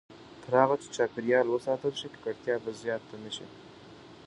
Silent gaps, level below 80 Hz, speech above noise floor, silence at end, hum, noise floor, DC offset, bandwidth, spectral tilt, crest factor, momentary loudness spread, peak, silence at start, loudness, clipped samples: none; -70 dBFS; 21 dB; 0 s; none; -51 dBFS; under 0.1%; 11 kHz; -5 dB/octave; 24 dB; 23 LU; -8 dBFS; 0.1 s; -30 LUFS; under 0.1%